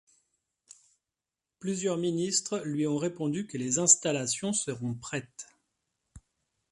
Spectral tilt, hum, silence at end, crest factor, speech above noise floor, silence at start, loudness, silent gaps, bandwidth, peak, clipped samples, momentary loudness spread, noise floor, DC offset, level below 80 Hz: -3.5 dB/octave; none; 0.55 s; 26 dB; 60 dB; 1.6 s; -28 LUFS; none; 11.5 kHz; -6 dBFS; under 0.1%; 16 LU; -90 dBFS; under 0.1%; -68 dBFS